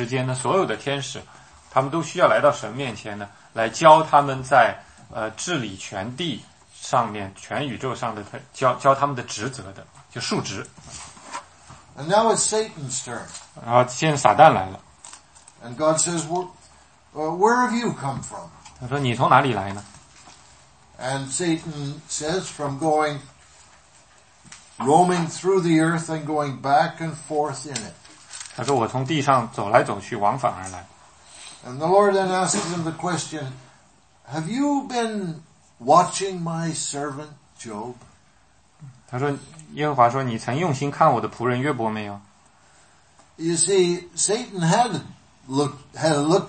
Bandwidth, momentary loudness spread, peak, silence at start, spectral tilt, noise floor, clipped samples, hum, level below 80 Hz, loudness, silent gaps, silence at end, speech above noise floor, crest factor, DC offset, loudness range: 8.8 kHz; 19 LU; 0 dBFS; 0 s; -4.5 dB/octave; -58 dBFS; under 0.1%; none; -60 dBFS; -22 LUFS; none; 0 s; 37 dB; 24 dB; under 0.1%; 7 LU